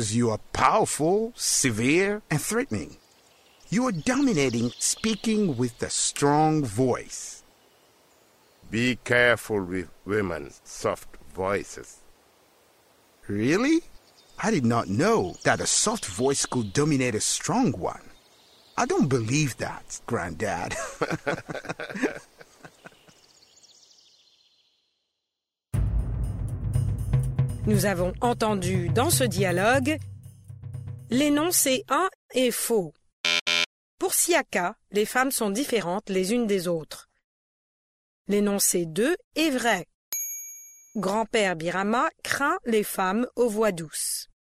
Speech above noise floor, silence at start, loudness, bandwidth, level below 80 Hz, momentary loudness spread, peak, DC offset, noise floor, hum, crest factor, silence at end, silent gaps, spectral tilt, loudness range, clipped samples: 61 dB; 0 s; -25 LUFS; 16 kHz; -44 dBFS; 12 LU; -6 dBFS; under 0.1%; -86 dBFS; none; 20 dB; 0.3 s; 32.15-32.29 s, 33.13-33.24 s, 33.41-33.46 s, 33.66-33.98 s, 37.24-38.25 s, 39.24-39.31 s, 39.94-40.12 s; -4 dB/octave; 8 LU; under 0.1%